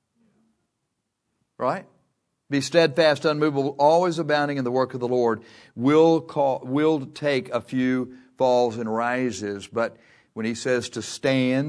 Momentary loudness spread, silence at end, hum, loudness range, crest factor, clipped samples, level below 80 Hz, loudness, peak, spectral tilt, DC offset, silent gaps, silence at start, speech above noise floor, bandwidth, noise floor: 11 LU; 0 s; none; 4 LU; 20 dB; under 0.1%; -70 dBFS; -23 LUFS; -4 dBFS; -5.5 dB/octave; under 0.1%; none; 1.6 s; 56 dB; 11 kHz; -78 dBFS